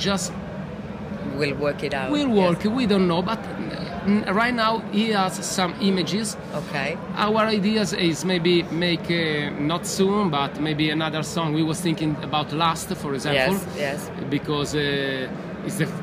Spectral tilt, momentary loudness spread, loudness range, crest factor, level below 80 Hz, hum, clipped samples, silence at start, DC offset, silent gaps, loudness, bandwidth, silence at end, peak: -5 dB/octave; 10 LU; 2 LU; 16 dB; -50 dBFS; none; under 0.1%; 0 s; under 0.1%; none; -23 LUFS; 15.5 kHz; 0 s; -6 dBFS